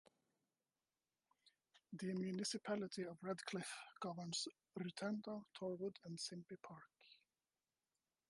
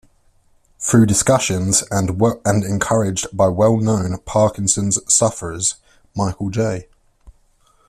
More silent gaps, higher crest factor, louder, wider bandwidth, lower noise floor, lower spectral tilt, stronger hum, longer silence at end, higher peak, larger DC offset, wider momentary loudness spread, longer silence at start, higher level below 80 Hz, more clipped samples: neither; about the same, 18 dB vs 18 dB; second, -48 LUFS vs -17 LUFS; second, 11.5 kHz vs 14 kHz; first, under -90 dBFS vs -56 dBFS; about the same, -4.5 dB/octave vs -4.5 dB/octave; neither; first, 1.15 s vs 0.6 s; second, -32 dBFS vs 0 dBFS; neither; first, 12 LU vs 9 LU; first, 1.45 s vs 0.8 s; second, under -90 dBFS vs -46 dBFS; neither